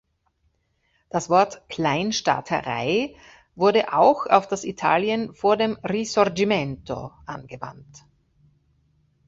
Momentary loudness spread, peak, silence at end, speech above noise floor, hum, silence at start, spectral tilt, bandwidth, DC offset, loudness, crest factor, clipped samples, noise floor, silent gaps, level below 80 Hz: 15 LU; -2 dBFS; 1.3 s; 47 dB; none; 1.15 s; -4.5 dB/octave; 8 kHz; under 0.1%; -22 LUFS; 22 dB; under 0.1%; -69 dBFS; none; -58 dBFS